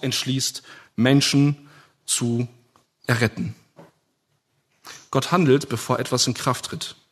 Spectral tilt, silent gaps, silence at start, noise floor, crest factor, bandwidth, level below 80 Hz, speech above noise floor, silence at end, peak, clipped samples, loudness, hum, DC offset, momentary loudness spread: -4.5 dB/octave; none; 0 s; -71 dBFS; 20 dB; 13.5 kHz; -62 dBFS; 49 dB; 0.2 s; -2 dBFS; under 0.1%; -22 LUFS; none; under 0.1%; 16 LU